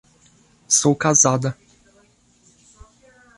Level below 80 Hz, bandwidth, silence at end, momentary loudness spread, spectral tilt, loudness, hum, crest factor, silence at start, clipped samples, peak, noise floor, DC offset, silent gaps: -56 dBFS; 11.5 kHz; 1.85 s; 13 LU; -3.5 dB/octave; -17 LUFS; none; 20 dB; 0.7 s; under 0.1%; -2 dBFS; -57 dBFS; under 0.1%; none